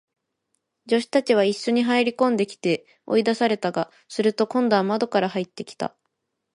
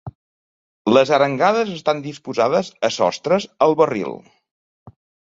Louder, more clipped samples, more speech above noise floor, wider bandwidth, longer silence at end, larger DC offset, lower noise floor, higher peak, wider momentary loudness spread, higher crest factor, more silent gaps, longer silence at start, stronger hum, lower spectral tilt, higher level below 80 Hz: second, -23 LUFS vs -18 LUFS; neither; second, 55 dB vs over 72 dB; first, 11.5 kHz vs 7.8 kHz; first, 0.7 s vs 0.35 s; neither; second, -77 dBFS vs under -90 dBFS; second, -6 dBFS vs -2 dBFS; about the same, 10 LU vs 11 LU; about the same, 18 dB vs 18 dB; second, none vs 0.15-0.85 s, 4.51-4.86 s; first, 0.85 s vs 0.05 s; neither; about the same, -5 dB/octave vs -5 dB/octave; second, -72 dBFS vs -60 dBFS